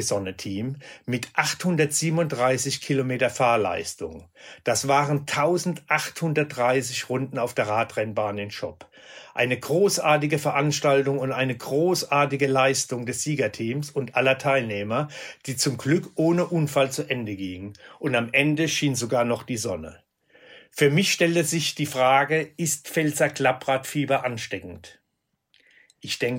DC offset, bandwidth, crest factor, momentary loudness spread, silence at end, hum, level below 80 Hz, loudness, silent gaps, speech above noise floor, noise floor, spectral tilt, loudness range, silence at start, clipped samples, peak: under 0.1%; 16.5 kHz; 20 dB; 12 LU; 0 s; none; -64 dBFS; -24 LUFS; none; 53 dB; -77 dBFS; -4.5 dB/octave; 3 LU; 0 s; under 0.1%; -4 dBFS